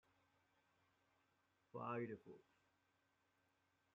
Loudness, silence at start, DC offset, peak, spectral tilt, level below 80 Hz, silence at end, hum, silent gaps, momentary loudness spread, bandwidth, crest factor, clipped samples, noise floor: -51 LUFS; 1.75 s; under 0.1%; -36 dBFS; -7 dB/octave; under -90 dBFS; 1.55 s; none; none; 18 LU; 6 kHz; 22 dB; under 0.1%; -84 dBFS